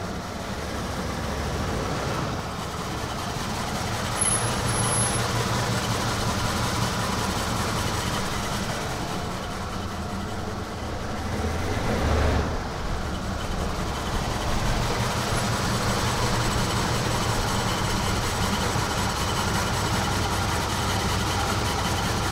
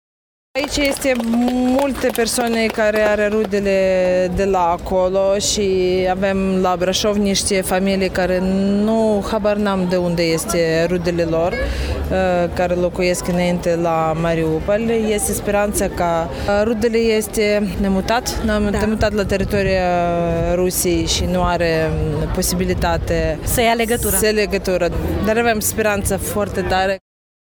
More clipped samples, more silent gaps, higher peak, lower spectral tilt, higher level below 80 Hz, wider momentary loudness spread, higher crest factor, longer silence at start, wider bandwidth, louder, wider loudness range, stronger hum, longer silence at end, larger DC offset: neither; neither; second, -10 dBFS vs -2 dBFS; about the same, -4 dB/octave vs -4.5 dB/octave; second, -36 dBFS vs -30 dBFS; first, 7 LU vs 3 LU; about the same, 16 dB vs 14 dB; second, 0 s vs 0.55 s; second, 16 kHz vs over 20 kHz; second, -26 LUFS vs -17 LUFS; first, 5 LU vs 1 LU; neither; second, 0 s vs 0.6 s; neither